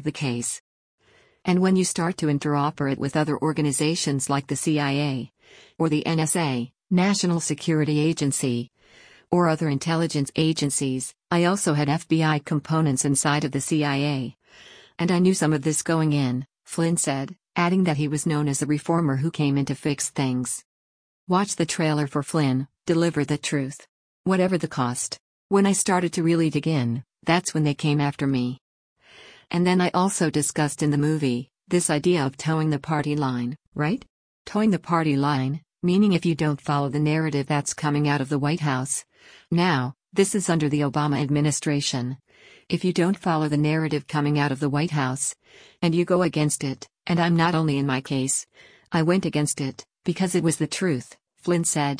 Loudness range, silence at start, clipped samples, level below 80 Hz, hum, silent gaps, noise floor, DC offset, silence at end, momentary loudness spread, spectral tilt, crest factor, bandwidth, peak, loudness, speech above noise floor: 2 LU; 0 s; under 0.1%; -60 dBFS; none; 0.60-0.98 s, 20.65-21.27 s, 23.89-24.24 s, 25.20-25.49 s, 28.61-28.96 s, 33.68-33.72 s, 34.10-34.45 s; -53 dBFS; under 0.1%; 0 s; 8 LU; -5 dB/octave; 16 dB; 10.5 kHz; -8 dBFS; -23 LUFS; 30 dB